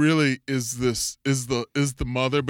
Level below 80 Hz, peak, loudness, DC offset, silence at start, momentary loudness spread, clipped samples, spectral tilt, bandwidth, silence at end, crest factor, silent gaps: -44 dBFS; -8 dBFS; -25 LUFS; under 0.1%; 0 s; 4 LU; under 0.1%; -4.5 dB/octave; 17 kHz; 0 s; 16 dB; none